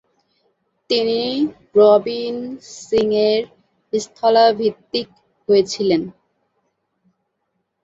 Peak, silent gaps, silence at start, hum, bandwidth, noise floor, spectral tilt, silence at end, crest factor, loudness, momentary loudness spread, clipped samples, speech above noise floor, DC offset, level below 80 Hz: -2 dBFS; none; 0.9 s; none; 7.8 kHz; -73 dBFS; -4.5 dB/octave; 1.7 s; 18 dB; -18 LUFS; 17 LU; under 0.1%; 56 dB; under 0.1%; -60 dBFS